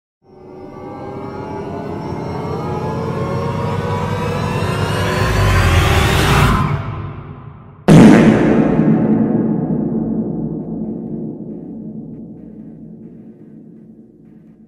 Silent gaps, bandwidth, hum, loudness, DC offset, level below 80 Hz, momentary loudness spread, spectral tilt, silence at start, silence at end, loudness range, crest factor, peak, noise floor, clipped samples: none; 16 kHz; none; -15 LUFS; under 0.1%; -30 dBFS; 22 LU; -6.5 dB/octave; 0.4 s; 0.3 s; 16 LU; 16 dB; 0 dBFS; -42 dBFS; under 0.1%